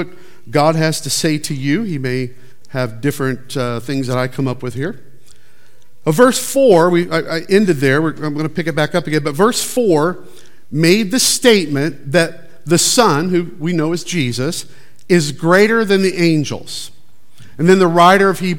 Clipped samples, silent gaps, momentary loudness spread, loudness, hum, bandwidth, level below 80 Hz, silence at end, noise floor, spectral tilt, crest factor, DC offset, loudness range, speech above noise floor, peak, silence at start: under 0.1%; none; 12 LU; -15 LUFS; none; 17.5 kHz; -58 dBFS; 0 s; -53 dBFS; -4.5 dB/octave; 16 dB; 3%; 6 LU; 39 dB; 0 dBFS; 0 s